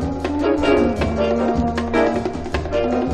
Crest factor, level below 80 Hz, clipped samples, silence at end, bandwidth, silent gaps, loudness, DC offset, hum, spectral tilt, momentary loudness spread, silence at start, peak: 14 dB; -32 dBFS; under 0.1%; 0 s; 10.5 kHz; none; -19 LUFS; under 0.1%; none; -7 dB/octave; 6 LU; 0 s; -4 dBFS